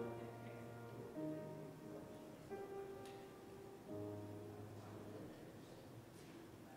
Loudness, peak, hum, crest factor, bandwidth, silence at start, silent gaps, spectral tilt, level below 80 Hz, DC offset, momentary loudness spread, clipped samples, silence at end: -54 LUFS; -36 dBFS; none; 16 dB; 16 kHz; 0 s; none; -6.5 dB/octave; -76 dBFS; under 0.1%; 8 LU; under 0.1%; 0 s